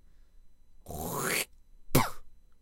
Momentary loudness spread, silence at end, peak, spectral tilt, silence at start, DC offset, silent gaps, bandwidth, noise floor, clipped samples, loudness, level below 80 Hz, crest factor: 11 LU; 0.1 s; -8 dBFS; -3.5 dB/octave; 0.35 s; under 0.1%; none; 17 kHz; -53 dBFS; under 0.1%; -32 LUFS; -48 dBFS; 26 dB